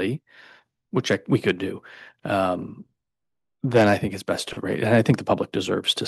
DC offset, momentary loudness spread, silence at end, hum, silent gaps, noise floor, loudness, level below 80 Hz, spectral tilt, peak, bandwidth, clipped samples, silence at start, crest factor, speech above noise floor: under 0.1%; 13 LU; 0 s; none; none; -87 dBFS; -23 LUFS; -60 dBFS; -5.5 dB/octave; -6 dBFS; 12.5 kHz; under 0.1%; 0 s; 20 dB; 64 dB